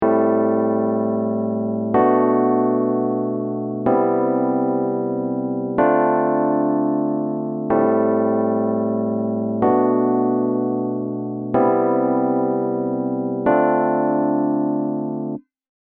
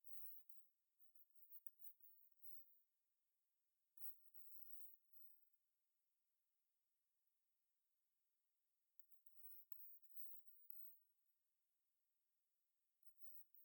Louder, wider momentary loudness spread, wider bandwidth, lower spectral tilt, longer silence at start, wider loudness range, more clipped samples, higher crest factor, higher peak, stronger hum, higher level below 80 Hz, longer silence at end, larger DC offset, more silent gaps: first, -19 LUFS vs -58 LUFS; second, 6 LU vs 14 LU; second, 3.3 kHz vs 19 kHz; first, -9.5 dB/octave vs 0 dB/octave; about the same, 0 s vs 0.05 s; second, 1 LU vs 5 LU; neither; second, 14 dB vs 26 dB; first, -4 dBFS vs -38 dBFS; neither; first, -60 dBFS vs under -90 dBFS; first, 0.5 s vs 0 s; neither; neither